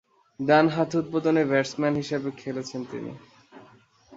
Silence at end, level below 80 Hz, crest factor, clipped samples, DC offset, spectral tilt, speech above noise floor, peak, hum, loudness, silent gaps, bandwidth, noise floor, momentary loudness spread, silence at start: 0 s; -66 dBFS; 20 dB; under 0.1%; under 0.1%; -6 dB/octave; 31 dB; -6 dBFS; none; -25 LUFS; none; 8 kHz; -56 dBFS; 14 LU; 0.4 s